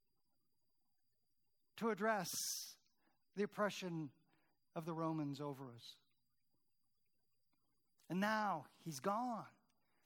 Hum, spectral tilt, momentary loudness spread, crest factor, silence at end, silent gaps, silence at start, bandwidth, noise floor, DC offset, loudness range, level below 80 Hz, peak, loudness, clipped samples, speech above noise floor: none; -4 dB/octave; 15 LU; 22 dB; 0.55 s; none; 1.75 s; 19 kHz; -88 dBFS; under 0.1%; 6 LU; under -90 dBFS; -24 dBFS; -43 LUFS; under 0.1%; 45 dB